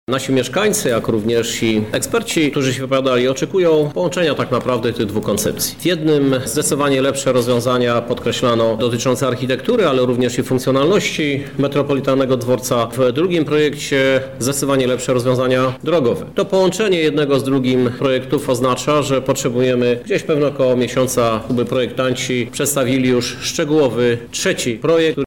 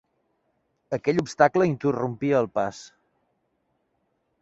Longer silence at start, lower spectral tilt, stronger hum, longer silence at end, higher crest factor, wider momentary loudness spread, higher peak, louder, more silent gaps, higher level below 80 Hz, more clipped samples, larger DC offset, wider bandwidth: second, 0.1 s vs 0.9 s; second, -4.5 dB/octave vs -6.5 dB/octave; neither; second, 0 s vs 1.55 s; second, 10 dB vs 24 dB; second, 4 LU vs 11 LU; about the same, -6 dBFS vs -4 dBFS; first, -16 LUFS vs -24 LUFS; neither; first, -48 dBFS vs -62 dBFS; neither; first, 0.5% vs under 0.1%; first, 19 kHz vs 8.2 kHz